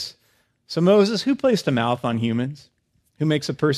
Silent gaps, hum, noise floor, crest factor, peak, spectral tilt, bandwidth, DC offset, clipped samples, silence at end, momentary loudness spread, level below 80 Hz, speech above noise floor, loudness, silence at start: none; none; -64 dBFS; 16 dB; -6 dBFS; -6 dB/octave; 14 kHz; under 0.1%; under 0.1%; 0 s; 11 LU; -62 dBFS; 44 dB; -21 LUFS; 0 s